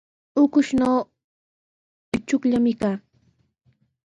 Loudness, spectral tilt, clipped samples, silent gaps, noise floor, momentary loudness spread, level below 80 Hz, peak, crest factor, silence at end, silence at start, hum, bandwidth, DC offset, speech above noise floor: -22 LUFS; -6 dB/octave; under 0.1%; 1.24-2.12 s; -65 dBFS; 11 LU; -56 dBFS; -8 dBFS; 16 dB; 1.2 s; 0.35 s; none; 10.5 kHz; under 0.1%; 45 dB